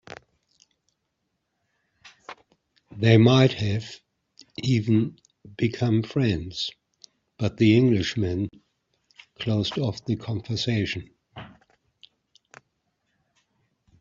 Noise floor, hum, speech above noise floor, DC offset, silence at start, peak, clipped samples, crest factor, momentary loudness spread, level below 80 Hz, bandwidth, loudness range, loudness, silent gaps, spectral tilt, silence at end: -78 dBFS; none; 55 dB; under 0.1%; 2.05 s; -4 dBFS; under 0.1%; 22 dB; 26 LU; -58 dBFS; 7.6 kHz; 9 LU; -24 LUFS; none; -7 dB/octave; 2.55 s